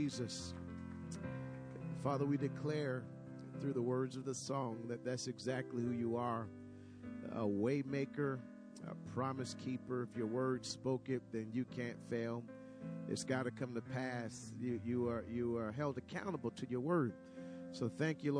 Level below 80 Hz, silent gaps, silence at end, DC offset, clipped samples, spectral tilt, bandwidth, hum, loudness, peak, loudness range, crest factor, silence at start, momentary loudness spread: -72 dBFS; none; 0 s; under 0.1%; under 0.1%; -6 dB/octave; 10.5 kHz; none; -42 LUFS; -24 dBFS; 2 LU; 18 dB; 0 s; 12 LU